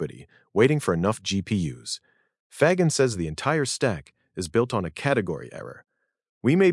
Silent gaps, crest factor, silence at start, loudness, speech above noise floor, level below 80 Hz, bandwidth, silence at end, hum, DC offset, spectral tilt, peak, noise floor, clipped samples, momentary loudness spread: 2.40-2.50 s, 6.29-6.41 s; 20 dB; 0 s; -25 LUFS; 22 dB; -58 dBFS; 12 kHz; 0 s; none; under 0.1%; -5.5 dB/octave; -6 dBFS; -45 dBFS; under 0.1%; 14 LU